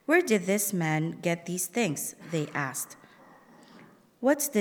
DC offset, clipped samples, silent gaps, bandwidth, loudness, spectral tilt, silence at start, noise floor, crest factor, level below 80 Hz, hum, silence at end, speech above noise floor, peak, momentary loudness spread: under 0.1%; under 0.1%; none; 19.5 kHz; -29 LUFS; -4.5 dB/octave; 0.1 s; -55 dBFS; 20 dB; -80 dBFS; none; 0 s; 27 dB; -10 dBFS; 9 LU